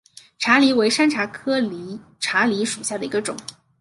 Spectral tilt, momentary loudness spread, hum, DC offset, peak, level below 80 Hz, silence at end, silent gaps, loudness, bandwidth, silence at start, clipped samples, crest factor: -3 dB/octave; 17 LU; none; under 0.1%; -2 dBFS; -66 dBFS; 0.3 s; none; -20 LUFS; 11.5 kHz; 0.4 s; under 0.1%; 20 dB